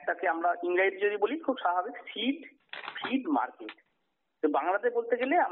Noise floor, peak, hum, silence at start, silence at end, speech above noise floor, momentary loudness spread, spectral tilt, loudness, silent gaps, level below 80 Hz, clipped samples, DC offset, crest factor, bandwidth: -80 dBFS; -14 dBFS; none; 0 s; 0 s; 50 dB; 13 LU; 0 dB/octave; -30 LUFS; none; -84 dBFS; under 0.1%; under 0.1%; 16 dB; 4.3 kHz